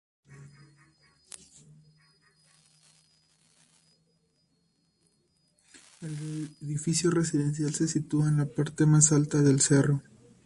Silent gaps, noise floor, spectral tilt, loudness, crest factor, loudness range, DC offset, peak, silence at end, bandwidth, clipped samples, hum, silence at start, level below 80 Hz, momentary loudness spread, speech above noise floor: none; -72 dBFS; -5 dB/octave; -26 LUFS; 24 dB; 20 LU; under 0.1%; -6 dBFS; 0.45 s; 11.5 kHz; under 0.1%; none; 0.3 s; -64 dBFS; 21 LU; 47 dB